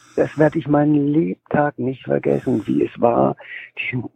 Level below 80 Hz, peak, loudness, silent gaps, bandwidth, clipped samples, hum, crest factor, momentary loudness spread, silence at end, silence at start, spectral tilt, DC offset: -54 dBFS; -2 dBFS; -19 LUFS; none; 8.4 kHz; under 0.1%; none; 18 dB; 9 LU; 0.1 s; 0.15 s; -9 dB/octave; under 0.1%